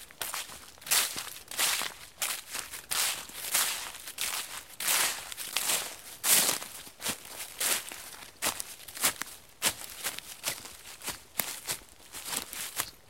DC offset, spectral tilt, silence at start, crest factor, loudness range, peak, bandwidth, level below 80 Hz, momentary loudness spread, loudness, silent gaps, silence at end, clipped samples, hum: 0.1%; 1 dB/octave; 0 s; 30 dB; 5 LU; -4 dBFS; 17 kHz; -66 dBFS; 14 LU; -31 LUFS; none; 0.15 s; under 0.1%; none